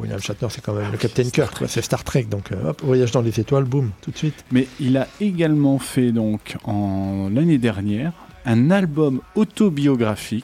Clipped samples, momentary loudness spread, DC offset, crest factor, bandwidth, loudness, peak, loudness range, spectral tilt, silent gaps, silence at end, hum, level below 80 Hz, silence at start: under 0.1%; 8 LU; under 0.1%; 14 dB; 16 kHz; -21 LUFS; -6 dBFS; 2 LU; -6.5 dB/octave; none; 0 s; none; -48 dBFS; 0 s